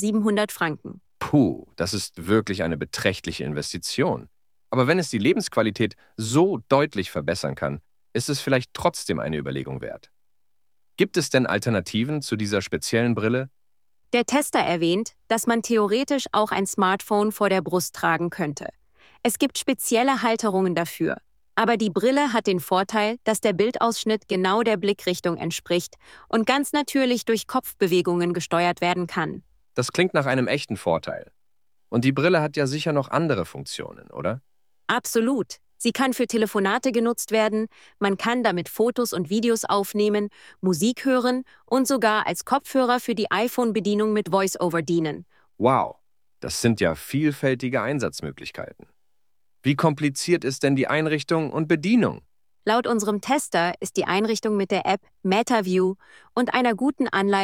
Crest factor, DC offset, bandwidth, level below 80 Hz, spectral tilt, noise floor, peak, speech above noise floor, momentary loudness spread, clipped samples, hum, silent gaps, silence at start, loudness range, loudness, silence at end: 20 dB; under 0.1%; 17 kHz; -58 dBFS; -5 dB/octave; -82 dBFS; -4 dBFS; 59 dB; 9 LU; under 0.1%; none; none; 0 s; 3 LU; -23 LUFS; 0 s